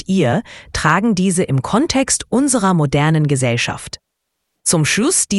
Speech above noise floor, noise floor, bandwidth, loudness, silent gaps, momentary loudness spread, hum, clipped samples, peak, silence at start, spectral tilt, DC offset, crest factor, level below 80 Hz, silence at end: 59 dB; -74 dBFS; 12 kHz; -16 LUFS; none; 7 LU; none; under 0.1%; 0 dBFS; 0.1 s; -4.5 dB/octave; under 0.1%; 16 dB; -42 dBFS; 0 s